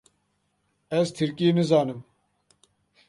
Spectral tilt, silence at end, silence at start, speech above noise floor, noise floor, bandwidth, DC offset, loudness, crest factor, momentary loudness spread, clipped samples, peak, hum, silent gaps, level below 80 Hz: -6.5 dB/octave; 1.05 s; 0.9 s; 50 dB; -73 dBFS; 11.5 kHz; under 0.1%; -24 LUFS; 20 dB; 10 LU; under 0.1%; -8 dBFS; 50 Hz at -55 dBFS; none; -70 dBFS